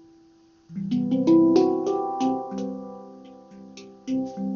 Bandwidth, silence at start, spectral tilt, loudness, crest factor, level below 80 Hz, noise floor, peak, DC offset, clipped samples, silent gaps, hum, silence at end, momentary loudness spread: 7 kHz; 0.7 s; -7.5 dB/octave; -23 LUFS; 18 dB; -64 dBFS; -56 dBFS; -8 dBFS; under 0.1%; under 0.1%; none; none; 0 s; 25 LU